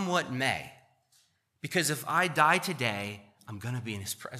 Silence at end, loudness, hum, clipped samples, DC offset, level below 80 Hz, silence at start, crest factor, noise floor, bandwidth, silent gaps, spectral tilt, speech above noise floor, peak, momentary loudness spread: 0 s; -29 LUFS; none; under 0.1%; under 0.1%; -72 dBFS; 0 s; 22 dB; -69 dBFS; 15 kHz; none; -3.5 dB/octave; 39 dB; -10 dBFS; 18 LU